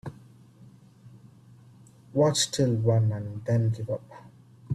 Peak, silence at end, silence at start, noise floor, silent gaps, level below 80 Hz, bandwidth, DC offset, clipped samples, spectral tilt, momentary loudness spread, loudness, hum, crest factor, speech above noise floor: -10 dBFS; 0 s; 0.05 s; -53 dBFS; none; -62 dBFS; 13 kHz; under 0.1%; under 0.1%; -5.5 dB/octave; 11 LU; -26 LUFS; none; 18 dB; 28 dB